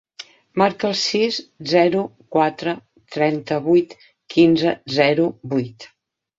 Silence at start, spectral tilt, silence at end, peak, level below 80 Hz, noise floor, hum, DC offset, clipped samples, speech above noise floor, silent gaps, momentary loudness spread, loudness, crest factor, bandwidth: 0.2 s; -5.5 dB/octave; 0.5 s; -2 dBFS; -60 dBFS; -43 dBFS; none; under 0.1%; under 0.1%; 24 dB; none; 14 LU; -19 LUFS; 18 dB; 7.8 kHz